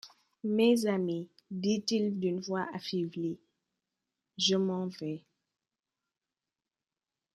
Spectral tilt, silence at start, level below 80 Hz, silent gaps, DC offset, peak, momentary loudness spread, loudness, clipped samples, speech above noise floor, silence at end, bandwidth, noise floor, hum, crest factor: -5 dB/octave; 0.05 s; -78 dBFS; none; under 0.1%; -14 dBFS; 14 LU; -32 LUFS; under 0.1%; over 59 dB; 2.15 s; 13 kHz; under -90 dBFS; none; 20 dB